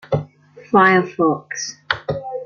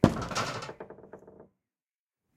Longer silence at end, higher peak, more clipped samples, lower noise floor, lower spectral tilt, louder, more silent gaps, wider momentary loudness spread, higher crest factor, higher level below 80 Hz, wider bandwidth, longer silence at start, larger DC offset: second, 0 s vs 0.95 s; about the same, -2 dBFS vs -4 dBFS; neither; second, -39 dBFS vs under -90 dBFS; about the same, -5 dB/octave vs -5.5 dB/octave; first, -18 LUFS vs -32 LUFS; neither; second, 13 LU vs 22 LU; second, 18 dB vs 28 dB; about the same, -54 dBFS vs -52 dBFS; second, 7.2 kHz vs 15.5 kHz; about the same, 0.1 s vs 0 s; neither